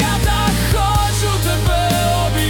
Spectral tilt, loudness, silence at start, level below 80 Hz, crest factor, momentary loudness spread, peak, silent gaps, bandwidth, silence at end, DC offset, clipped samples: -4.5 dB/octave; -16 LUFS; 0 s; -22 dBFS; 10 dB; 1 LU; -4 dBFS; none; 18 kHz; 0 s; under 0.1%; under 0.1%